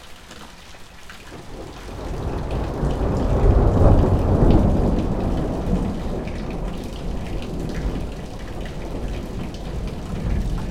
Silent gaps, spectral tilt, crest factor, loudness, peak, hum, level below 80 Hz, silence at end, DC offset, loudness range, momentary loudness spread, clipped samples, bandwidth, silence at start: none; -8 dB/octave; 22 dB; -23 LUFS; 0 dBFS; none; -26 dBFS; 0 s; under 0.1%; 11 LU; 22 LU; under 0.1%; 12 kHz; 0 s